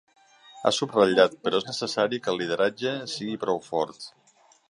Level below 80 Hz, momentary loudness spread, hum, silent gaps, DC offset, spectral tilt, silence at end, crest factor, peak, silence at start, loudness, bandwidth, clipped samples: -68 dBFS; 10 LU; none; none; under 0.1%; -4 dB/octave; 0.6 s; 22 dB; -4 dBFS; 0.55 s; -25 LUFS; 11.5 kHz; under 0.1%